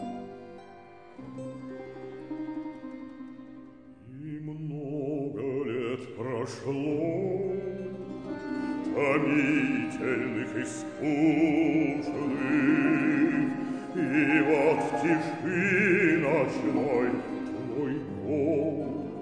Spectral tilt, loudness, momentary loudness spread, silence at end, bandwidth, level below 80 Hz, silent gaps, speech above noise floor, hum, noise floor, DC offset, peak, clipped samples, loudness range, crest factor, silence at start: -7 dB/octave; -28 LUFS; 18 LU; 0 s; 10 kHz; -64 dBFS; none; 24 dB; none; -50 dBFS; under 0.1%; -10 dBFS; under 0.1%; 15 LU; 18 dB; 0 s